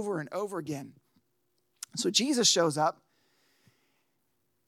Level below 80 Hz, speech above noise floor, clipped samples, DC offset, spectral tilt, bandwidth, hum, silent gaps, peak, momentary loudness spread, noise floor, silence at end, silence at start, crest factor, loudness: -88 dBFS; 49 dB; under 0.1%; under 0.1%; -2.5 dB/octave; 16.5 kHz; none; none; -10 dBFS; 16 LU; -78 dBFS; 1.75 s; 0 s; 24 dB; -28 LUFS